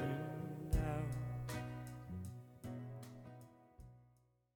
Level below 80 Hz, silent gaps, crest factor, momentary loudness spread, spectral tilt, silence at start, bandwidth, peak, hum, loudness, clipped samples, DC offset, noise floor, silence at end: -50 dBFS; none; 20 dB; 21 LU; -7 dB/octave; 0 s; 19 kHz; -24 dBFS; none; -45 LUFS; under 0.1%; under 0.1%; -73 dBFS; 0.5 s